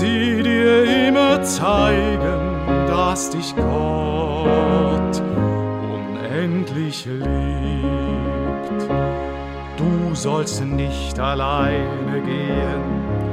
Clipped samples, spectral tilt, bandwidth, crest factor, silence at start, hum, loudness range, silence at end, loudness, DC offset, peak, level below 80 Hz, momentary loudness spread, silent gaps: under 0.1%; -5.5 dB/octave; 15.5 kHz; 16 dB; 0 s; none; 6 LU; 0 s; -20 LUFS; under 0.1%; -4 dBFS; -30 dBFS; 9 LU; none